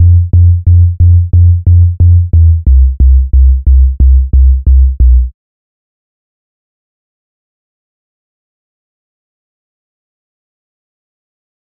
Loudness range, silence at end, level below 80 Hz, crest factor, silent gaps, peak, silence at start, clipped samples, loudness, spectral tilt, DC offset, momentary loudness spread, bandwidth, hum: 8 LU; 6.4 s; -10 dBFS; 8 dB; none; 0 dBFS; 0 s; 0.3%; -8 LUFS; -17 dB/octave; under 0.1%; 2 LU; 0.7 kHz; none